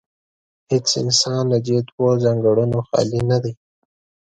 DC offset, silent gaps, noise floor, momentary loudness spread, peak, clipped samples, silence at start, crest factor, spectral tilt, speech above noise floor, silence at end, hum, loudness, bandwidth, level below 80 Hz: under 0.1%; 1.92-1.98 s; under -90 dBFS; 5 LU; -4 dBFS; under 0.1%; 0.7 s; 16 dB; -5 dB/octave; over 72 dB; 0.75 s; none; -18 LUFS; 9.2 kHz; -52 dBFS